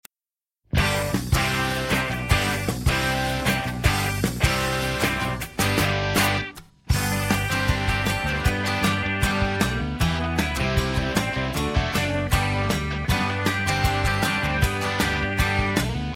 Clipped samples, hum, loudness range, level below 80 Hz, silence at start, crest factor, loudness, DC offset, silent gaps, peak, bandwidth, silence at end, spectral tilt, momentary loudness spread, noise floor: under 0.1%; none; 1 LU; -32 dBFS; 0.75 s; 18 dB; -23 LUFS; under 0.1%; none; -4 dBFS; 16.5 kHz; 0 s; -4.5 dB/octave; 3 LU; under -90 dBFS